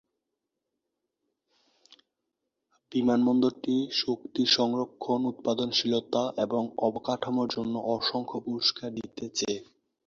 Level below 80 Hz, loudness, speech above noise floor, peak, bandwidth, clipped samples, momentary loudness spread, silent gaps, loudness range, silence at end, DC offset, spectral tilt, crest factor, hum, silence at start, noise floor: -70 dBFS; -28 LUFS; 56 dB; -10 dBFS; 7.6 kHz; under 0.1%; 9 LU; none; 4 LU; 0.45 s; under 0.1%; -4.5 dB/octave; 20 dB; none; 2.9 s; -85 dBFS